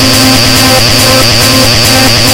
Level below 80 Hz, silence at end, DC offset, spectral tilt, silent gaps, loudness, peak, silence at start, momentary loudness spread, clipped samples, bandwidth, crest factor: -22 dBFS; 0 s; under 0.1%; -3 dB/octave; none; -3 LUFS; 0 dBFS; 0 s; 0 LU; 5%; over 20 kHz; 4 dB